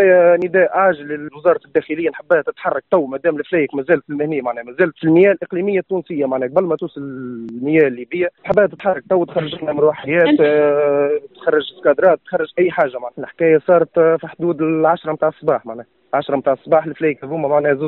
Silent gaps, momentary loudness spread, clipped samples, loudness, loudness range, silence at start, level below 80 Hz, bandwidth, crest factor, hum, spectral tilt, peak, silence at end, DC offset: none; 9 LU; under 0.1%; -17 LUFS; 3 LU; 0 s; -60 dBFS; 4.3 kHz; 14 dB; none; -5 dB/octave; -2 dBFS; 0 s; under 0.1%